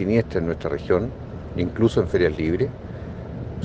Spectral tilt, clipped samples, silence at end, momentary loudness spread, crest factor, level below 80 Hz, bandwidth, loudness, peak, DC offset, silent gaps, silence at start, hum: -8 dB/octave; under 0.1%; 0 s; 14 LU; 18 dB; -40 dBFS; 8.8 kHz; -23 LUFS; -4 dBFS; under 0.1%; none; 0 s; none